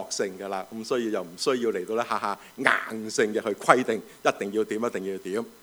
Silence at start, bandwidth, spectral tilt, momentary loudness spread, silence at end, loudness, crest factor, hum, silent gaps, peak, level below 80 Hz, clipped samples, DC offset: 0 s; over 20 kHz; -3.5 dB/octave; 10 LU; 0.1 s; -27 LUFS; 26 dB; none; none; -2 dBFS; -72 dBFS; under 0.1%; under 0.1%